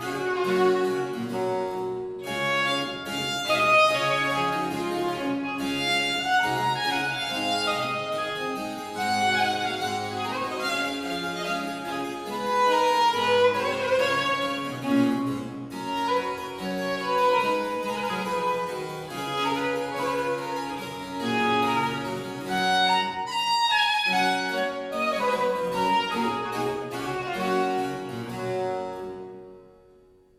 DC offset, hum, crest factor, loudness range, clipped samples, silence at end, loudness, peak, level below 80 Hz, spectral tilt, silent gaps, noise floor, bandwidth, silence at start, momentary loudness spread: under 0.1%; none; 16 dB; 4 LU; under 0.1%; 0.7 s; -25 LUFS; -10 dBFS; -62 dBFS; -4 dB/octave; none; -56 dBFS; 16 kHz; 0 s; 10 LU